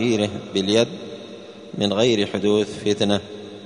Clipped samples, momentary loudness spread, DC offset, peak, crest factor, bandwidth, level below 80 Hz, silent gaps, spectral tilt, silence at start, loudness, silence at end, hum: under 0.1%; 17 LU; under 0.1%; -2 dBFS; 18 dB; 10.5 kHz; -58 dBFS; none; -5 dB/octave; 0 s; -21 LUFS; 0 s; none